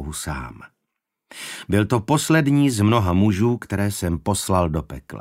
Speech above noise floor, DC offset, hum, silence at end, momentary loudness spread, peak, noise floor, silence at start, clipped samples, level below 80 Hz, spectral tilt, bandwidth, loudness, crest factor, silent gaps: 59 dB; under 0.1%; none; 0 s; 15 LU; -4 dBFS; -80 dBFS; 0 s; under 0.1%; -40 dBFS; -5.5 dB/octave; 16 kHz; -20 LUFS; 18 dB; none